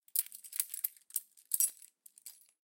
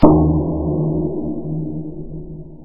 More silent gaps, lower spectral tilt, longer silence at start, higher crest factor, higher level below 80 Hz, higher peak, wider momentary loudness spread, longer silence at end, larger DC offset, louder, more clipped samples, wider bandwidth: neither; second, 6.5 dB/octave vs -13 dB/octave; first, 0.15 s vs 0 s; first, 28 dB vs 18 dB; second, under -90 dBFS vs -30 dBFS; second, -12 dBFS vs 0 dBFS; first, 22 LU vs 17 LU; first, 0.4 s vs 0 s; neither; second, -35 LUFS vs -19 LUFS; neither; first, 17 kHz vs 3 kHz